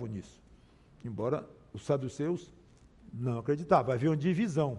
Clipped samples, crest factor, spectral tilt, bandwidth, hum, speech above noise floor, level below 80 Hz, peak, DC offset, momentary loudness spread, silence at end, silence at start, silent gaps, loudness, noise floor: under 0.1%; 20 dB; -8 dB/octave; 11 kHz; none; 28 dB; -62 dBFS; -12 dBFS; under 0.1%; 17 LU; 0 s; 0 s; none; -32 LUFS; -59 dBFS